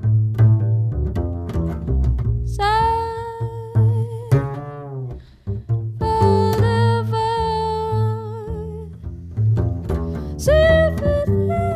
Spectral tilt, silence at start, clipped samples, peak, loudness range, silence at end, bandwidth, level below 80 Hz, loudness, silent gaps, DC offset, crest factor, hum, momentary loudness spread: -7.5 dB/octave; 0 s; under 0.1%; -4 dBFS; 3 LU; 0 s; 12 kHz; -30 dBFS; -20 LUFS; none; under 0.1%; 14 dB; none; 14 LU